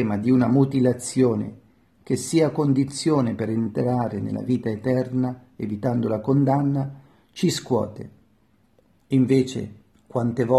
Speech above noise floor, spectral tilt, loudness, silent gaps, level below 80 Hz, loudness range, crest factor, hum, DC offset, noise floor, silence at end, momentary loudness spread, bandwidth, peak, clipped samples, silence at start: 40 dB; -7 dB/octave; -23 LUFS; none; -60 dBFS; 3 LU; 18 dB; none; under 0.1%; -62 dBFS; 0 s; 12 LU; 13 kHz; -4 dBFS; under 0.1%; 0 s